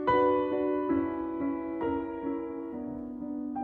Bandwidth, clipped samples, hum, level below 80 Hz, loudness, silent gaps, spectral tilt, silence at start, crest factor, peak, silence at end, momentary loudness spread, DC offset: 4.3 kHz; under 0.1%; none; -58 dBFS; -31 LUFS; none; -9 dB/octave; 0 s; 16 dB; -14 dBFS; 0 s; 12 LU; under 0.1%